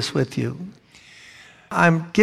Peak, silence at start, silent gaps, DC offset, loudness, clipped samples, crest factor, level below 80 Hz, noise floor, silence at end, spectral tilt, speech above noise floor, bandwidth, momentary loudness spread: -2 dBFS; 0 s; none; under 0.1%; -21 LUFS; under 0.1%; 20 dB; -60 dBFS; -49 dBFS; 0 s; -6 dB/octave; 29 dB; 12.5 kHz; 24 LU